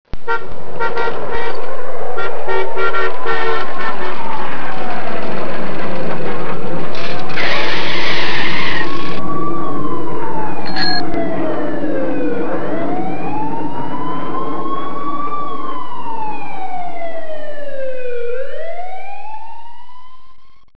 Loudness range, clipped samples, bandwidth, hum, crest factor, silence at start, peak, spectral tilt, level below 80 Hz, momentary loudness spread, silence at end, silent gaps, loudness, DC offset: 7 LU; under 0.1%; 5.4 kHz; none; 10 dB; 0.05 s; 0 dBFS; -6 dB/octave; -40 dBFS; 10 LU; 0.05 s; none; -22 LUFS; 40%